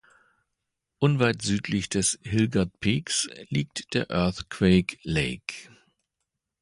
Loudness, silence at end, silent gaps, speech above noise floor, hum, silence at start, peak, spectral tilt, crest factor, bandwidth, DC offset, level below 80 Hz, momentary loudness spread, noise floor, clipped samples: -26 LUFS; 0.95 s; none; 57 dB; none; 1 s; -8 dBFS; -4.5 dB/octave; 20 dB; 11.5 kHz; under 0.1%; -48 dBFS; 8 LU; -83 dBFS; under 0.1%